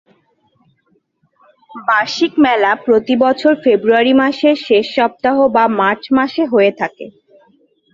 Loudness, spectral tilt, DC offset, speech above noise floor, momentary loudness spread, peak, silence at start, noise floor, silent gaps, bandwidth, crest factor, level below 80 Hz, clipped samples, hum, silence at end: -13 LUFS; -5 dB/octave; under 0.1%; 48 dB; 4 LU; 0 dBFS; 1.75 s; -61 dBFS; none; 7.6 kHz; 14 dB; -58 dBFS; under 0.1%; none; 0.85 s